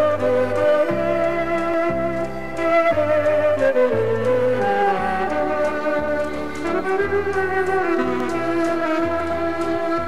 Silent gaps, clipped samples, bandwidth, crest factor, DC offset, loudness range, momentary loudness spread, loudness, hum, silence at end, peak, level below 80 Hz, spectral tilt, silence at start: none; under 0.1%; 14.5 kHz; 12 dB; 2%; 3 LU; 5 LU; -20 LUFS; none; 0 s; -8 dBFS; -46 dBFS; -6.5 dB/octave; 0 s